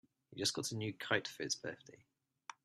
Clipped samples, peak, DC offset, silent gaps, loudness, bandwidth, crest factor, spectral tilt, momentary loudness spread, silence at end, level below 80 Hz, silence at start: under 0.1%; -16 dBFS; under 0.1%; none; -39 LUFS; 14 kHz; 26 dB; -2.5 dB/octave; 18 LU; 0.1 s; -80 dBFS; 0.3 s